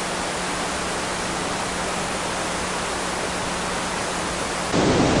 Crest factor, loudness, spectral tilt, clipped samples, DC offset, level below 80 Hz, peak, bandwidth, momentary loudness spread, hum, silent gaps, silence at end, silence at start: 18 dB; -24 LUFS; -3.5 dB/octave; under 0.1%; under 0.1%; -42 dBFS; -6 dBFS; 11.5 kHz; 5 LU; none; none; 0 s; 0 s